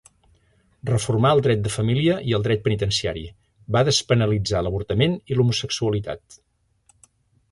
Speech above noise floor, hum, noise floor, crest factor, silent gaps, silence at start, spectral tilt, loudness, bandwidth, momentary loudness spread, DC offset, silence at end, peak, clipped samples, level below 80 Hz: 41 dB; none; -62 dBFS; 18 dB; none; 0.85 s; -5.5 dB/octave; -21 LUFS; 11.5 kHz; 10 LU; under 0.1%; 1.15 s; -4 dBFS; under 0.1%; -44 dBFS